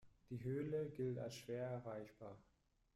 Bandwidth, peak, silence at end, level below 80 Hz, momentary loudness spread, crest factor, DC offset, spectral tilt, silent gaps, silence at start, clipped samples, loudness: 13.5 kHz; -34 dBFS; 0.55 s; -76 dBFS; 14 LU; 14 dB; under 0.1%; -7 dB/octave; none; 0 s; under 0.1%; -47 LUFS